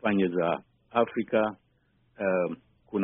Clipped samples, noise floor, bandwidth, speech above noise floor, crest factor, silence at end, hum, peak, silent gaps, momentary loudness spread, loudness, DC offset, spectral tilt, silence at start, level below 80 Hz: under 0.1%; -68 dBFS; 3.9 kHz; 41 dB; 20 dB; 0 s; none; -10 dBFS; none; 9 LU; -29 LUFS; under 0.1%; -3 dB/octave; 0.05 s; -66 dBFS